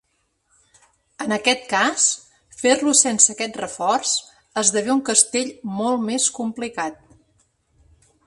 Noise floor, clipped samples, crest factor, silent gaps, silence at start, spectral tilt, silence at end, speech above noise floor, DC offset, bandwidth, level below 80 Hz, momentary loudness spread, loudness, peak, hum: -69 dBFS; under 0.1%; 22 dB; none; 1.2 s; -1.5 dB/octave; 1.3 s; 49 dB; under 0.1%; 11.5 kHz; -64 dBFS; 12 LU; -19 LUFS; 0 dBFS; none